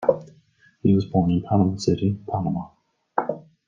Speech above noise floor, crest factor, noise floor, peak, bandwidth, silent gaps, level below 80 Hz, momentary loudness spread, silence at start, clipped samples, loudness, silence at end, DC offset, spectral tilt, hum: 36 dB; 20 dB; -58 dBFS; -2 dBFS; 7.6 kHz; none; -56 dBFS; 11 LU; 0 s; under 0.1%; -23 LUFS; 0.25 s; under 0.1%; -8 dB/octave; none